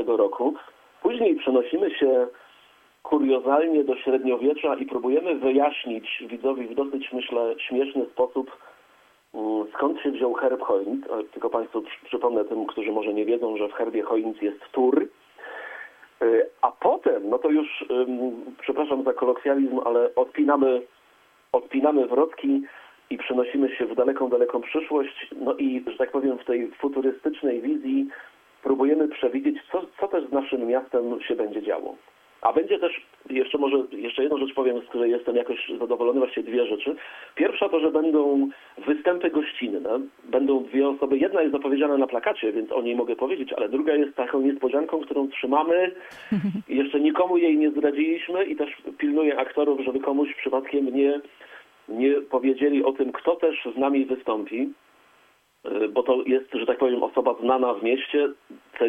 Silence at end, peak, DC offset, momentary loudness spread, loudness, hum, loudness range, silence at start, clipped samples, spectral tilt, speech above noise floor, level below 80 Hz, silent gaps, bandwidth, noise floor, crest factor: 0 s; -4 dBFS; under 0.1%; 8 LU; -24 LUFS; none; 3 LU; 0 s; under 0.1%; -7 dB/octave; 37 dB; -70 dBFS; none; 3.8 kHz; -61 dBFS; 20 dB